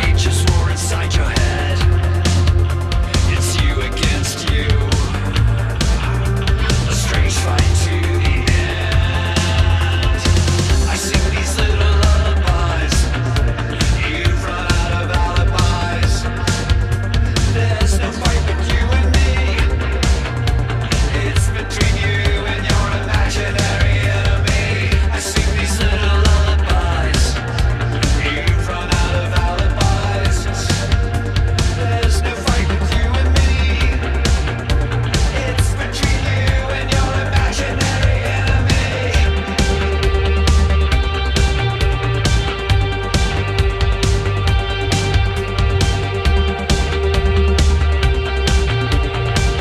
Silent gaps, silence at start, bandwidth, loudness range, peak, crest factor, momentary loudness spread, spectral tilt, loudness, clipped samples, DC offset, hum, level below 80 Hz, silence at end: none; 0 s; 13.5 kHz; 1 LU; -2 dBFS; 14 dB; 3 LU; -5 dB/octave; -17 LUFS; under 0.1%; under 0.1%; none; -18 dBFS; 0 s